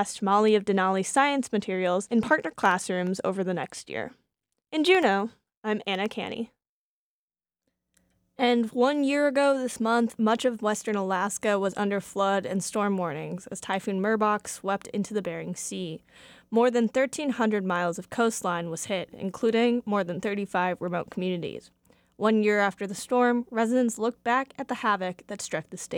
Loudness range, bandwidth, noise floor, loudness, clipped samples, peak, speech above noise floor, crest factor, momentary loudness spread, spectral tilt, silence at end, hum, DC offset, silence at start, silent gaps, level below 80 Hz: 4 LU; 17 kHz; under -90 dBFS; -27 LUFS; under 0.1%; -8 dBFS; over 64 dB; 18 dB; 11 LU; -4.5 dB/octave; 0 s; none; under 0.1%; 0 s; 5.57-5.62 s, 6.69-7.28 s; -68 dBFS